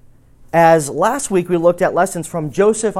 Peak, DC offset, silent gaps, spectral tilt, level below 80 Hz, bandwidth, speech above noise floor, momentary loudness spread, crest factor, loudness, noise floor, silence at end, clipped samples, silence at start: 0 dBFS; under 0.1%; none; -5.5 dB/octave; -48 dBFS; 16 kHz; 29 dB; 7 LU; 16 dB; -15 LUFS; -44 dBFS; 0 s; under 0.1%; 0.55 s